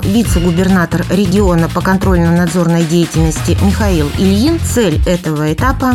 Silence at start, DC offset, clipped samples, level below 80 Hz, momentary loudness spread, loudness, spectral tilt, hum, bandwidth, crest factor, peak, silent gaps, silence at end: 0 s; under 0.1%; under 0.1%; -22 dBFS; 3 LU; -12 LUFS; -6 dB/octave; none; 16 kHz; 10 dB; 0 dBFS; none; 0 s